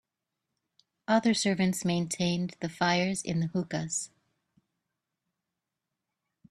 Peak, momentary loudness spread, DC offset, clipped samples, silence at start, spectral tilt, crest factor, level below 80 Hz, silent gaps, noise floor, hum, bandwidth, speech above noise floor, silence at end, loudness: -10 dBFS; 8 LU; under 0.1%; under 0.1%; 1.1 s; -4.5 dB/octave; 22 dB; -66 dBFS; none; -87 dBFS; none; 13 kHz; 58 dB; 2.45 s; -29 LUFS